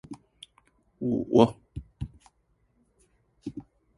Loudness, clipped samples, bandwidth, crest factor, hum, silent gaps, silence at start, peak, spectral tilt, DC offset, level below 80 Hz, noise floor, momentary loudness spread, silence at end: -25 LUFS; under 0.1%; 11.5 kHz; 28 dB; none; none; 0.1 s; -4 dBFS; -8 dB/octave; under 0.1%; -54 dBFS; -70 dBFS; 24 LU; 0.35 s